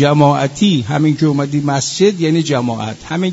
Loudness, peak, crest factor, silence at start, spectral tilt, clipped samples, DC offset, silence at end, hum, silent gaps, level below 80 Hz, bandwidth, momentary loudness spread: -14 LUFS; 0 dBFS; 14 dB; 0 s; -5.5 dB/octave; under 0.1%; under 0.1%; 0 s; none; none; -50 dBFS; 8 kHz; 7 LU